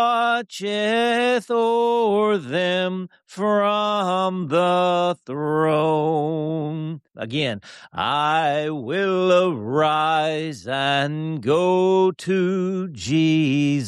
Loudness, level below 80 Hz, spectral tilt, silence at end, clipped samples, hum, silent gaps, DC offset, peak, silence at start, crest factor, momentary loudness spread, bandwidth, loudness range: -21 LUFS; -64 dBFS; -6 dB/octave; 0 s; under 0.1%; none; none; under 0.1%; -8 dBFS; 0 s; 12 dB; 8 LU; 12 kHz; 3 LU